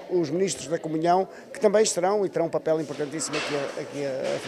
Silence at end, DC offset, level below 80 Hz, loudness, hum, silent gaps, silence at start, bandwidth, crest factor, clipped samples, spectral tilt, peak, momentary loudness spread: 0 s; under 0.1%; -68 dBFS; -26 LUFS; none; none; 0 s; 14 kHz; 18 dB; under 0.1%; -4 dB/octave; -8 dBFS; 9 LU